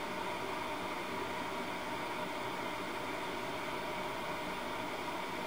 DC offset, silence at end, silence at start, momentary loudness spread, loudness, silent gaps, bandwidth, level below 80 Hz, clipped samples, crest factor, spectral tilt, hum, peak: 0.2%; 0 s; 0 s; 1 LU; -39 LUFS; none; 16 kHz; -64 dBFS; under 0.1%; 14 dB; -3.5 dB/octave; none; -26 dBFS